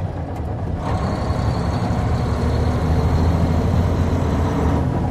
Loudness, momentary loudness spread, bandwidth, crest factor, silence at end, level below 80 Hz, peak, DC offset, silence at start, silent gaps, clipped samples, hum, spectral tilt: -20 LUFS; 7 LU; 11 kHz; 12 dB; 0 s; -26 dBFS; -6 dBFS; under 0.1%; 0 s; none; under 0.1%; none; -8 dB/octave